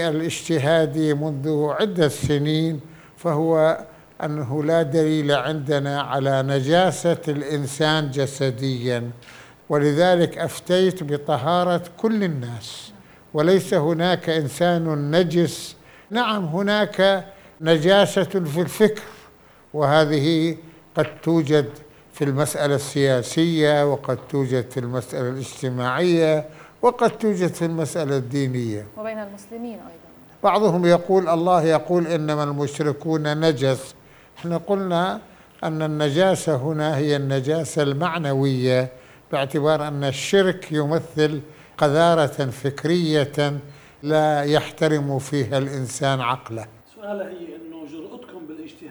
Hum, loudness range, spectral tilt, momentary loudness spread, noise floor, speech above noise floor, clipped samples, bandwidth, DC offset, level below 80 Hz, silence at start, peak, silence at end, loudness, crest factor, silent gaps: none; 3 LU; -6 dB/octave; 14 LU; -50 dBFS; 29 dB; under 0.1%; over 20 kHz; under 0.1%; -58 dBFS; 0 s; -2 dBFS; 0 s; -21 LUFS; 20 dB; none